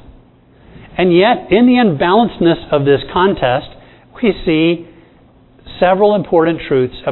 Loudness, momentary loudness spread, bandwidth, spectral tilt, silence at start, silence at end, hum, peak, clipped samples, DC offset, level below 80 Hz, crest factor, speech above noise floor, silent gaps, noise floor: -13 LUFS; 6 LU; 4.2 kHz; -10 dB/octave; 0.75 s; 0 s; none; 0 dBFS; under 0.1%; under 0.1%; -40 dBFS; 14 dB; 34 dB; none; -46 dBFS